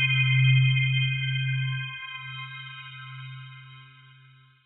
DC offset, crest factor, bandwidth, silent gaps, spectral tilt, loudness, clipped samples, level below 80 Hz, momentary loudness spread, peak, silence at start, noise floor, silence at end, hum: under 0.1%; 16 dB; 4 kHz; none; -7 dB/octave; -24 LUFS; under 0.1%; -64 dBFS; 21 LU; -10 dBFS; 0 s; -55 dBFS; 0.8 s; none